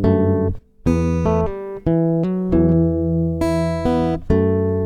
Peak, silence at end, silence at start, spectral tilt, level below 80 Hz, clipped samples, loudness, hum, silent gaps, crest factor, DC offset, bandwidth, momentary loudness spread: -2 dBFS; 0 s; 0 s; -9 dB/octave; -32 dBFS; under 0.1%; -19 LUFS; none; none; 16 dB; under 0.1%; 10 kHz; 5 LU